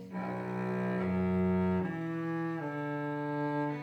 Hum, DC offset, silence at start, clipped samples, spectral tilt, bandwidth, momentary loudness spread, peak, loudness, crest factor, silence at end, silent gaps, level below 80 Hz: none; under 0.1%; 0 s; under 0.1%; -9.5 dB/octave; 6.2 kHz; 6 LU; -22 dBFS; -34 LUFS; 12 dB; 0 s; none; -66 dBFS